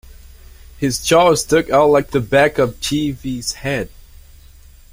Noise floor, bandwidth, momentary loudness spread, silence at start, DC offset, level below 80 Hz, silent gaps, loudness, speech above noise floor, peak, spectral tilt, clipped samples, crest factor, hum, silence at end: -43 dBFS; 16.5 kHz; 10 LU; 0.8 s; under 0.1%; -40 dBFS; none; -16 LUFS; 27 dB; -2 dBFS; -4.5 dB/octave; under 0.1%; 16 dB; none; 1.05 s